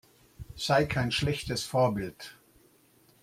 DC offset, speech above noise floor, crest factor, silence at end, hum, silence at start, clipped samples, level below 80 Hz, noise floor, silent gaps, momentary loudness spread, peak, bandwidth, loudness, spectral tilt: under 0.1%; 34 dB; 20 dB; 0.9 s; none; 0.4 s; under 0.1%; -52 dBFS; -63 dBFS; none; 21 LU; -12 dBFS; 16 kHz; -29 LUFS; -5 dB/octave